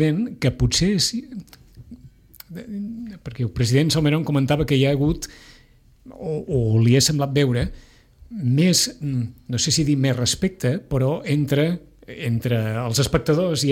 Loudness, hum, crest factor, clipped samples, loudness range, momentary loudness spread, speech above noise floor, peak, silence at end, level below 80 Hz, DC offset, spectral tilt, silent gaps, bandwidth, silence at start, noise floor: -21 LUFS; none; 18 dB; under 0.1%; 4 LU; 15 LU; 32 dB; -4 dBFS; 0 s; -40 dBFS; under 0.1%; -5 dB/octave; none; 16.5 kHz; 0 s; -53 dBFS